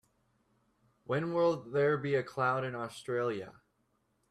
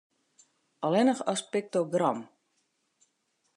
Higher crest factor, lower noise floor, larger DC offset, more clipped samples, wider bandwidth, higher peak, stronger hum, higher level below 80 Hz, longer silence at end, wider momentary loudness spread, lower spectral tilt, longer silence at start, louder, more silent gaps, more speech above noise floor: about the same, 18 dB vs 18 dB; about the same, -76 dBFS vs -76 dBFS; neither; neither; first, 12.5 kHz vs 11 kHz; second, -18 dBFS vs -12 dBFS; neither; first, -76 dBFS vs -88 dBFS; second, 0.8 s vs 1.3 s; about the same, 9 LU vs 8 LU; first, -7 dB/octave vs -5 dB/octave; first, 1.1 s vs 0.8 s; second, -33 LUFS vs -29 LUFS; neither; second, 44 dB vs 48 dB